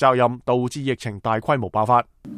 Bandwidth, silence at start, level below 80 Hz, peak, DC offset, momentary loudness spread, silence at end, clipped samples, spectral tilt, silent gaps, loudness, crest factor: 13.5 kHz; 0 s; -54 dBFS; -4 dBFS; under 0.1%; 7 LU; 0 s; under 0.1%; -6.5 dB/octave; none; -21 LUFS; 18 dB